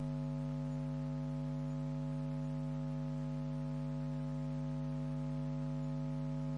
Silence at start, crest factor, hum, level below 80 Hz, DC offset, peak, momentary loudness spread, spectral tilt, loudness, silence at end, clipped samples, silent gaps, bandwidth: 0 s; 8 dB; 50 Hz at -40 dBFS; -56 dBFS; under 0.1%; -32 dBFS; 1 LU; -9 dB/octave; -40 LUFS; 0 s; under 0.1%; none; 7.6 kHz